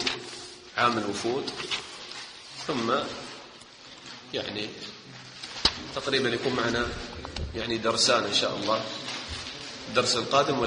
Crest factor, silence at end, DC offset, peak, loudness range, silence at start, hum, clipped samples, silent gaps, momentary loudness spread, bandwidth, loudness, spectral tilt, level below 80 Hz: 26 dB; 0 s; under 0.1%; -4 dBFS; 7 LU; 0 s; none; under 0.1%; none; 17 LU; 10 kHz; -28 LUFS; -3 dB/octave; -50 dBFS